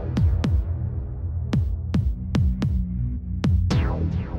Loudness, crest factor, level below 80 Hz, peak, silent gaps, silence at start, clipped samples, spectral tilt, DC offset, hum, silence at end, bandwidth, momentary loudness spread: -25 LUFS; 12 dB; -28 dBFS; -10 dBFS; none; 0 s; under 0.1%; -8 dB/octave; under 0.1%; none; 0 s; 7.8 kHz; 7 LU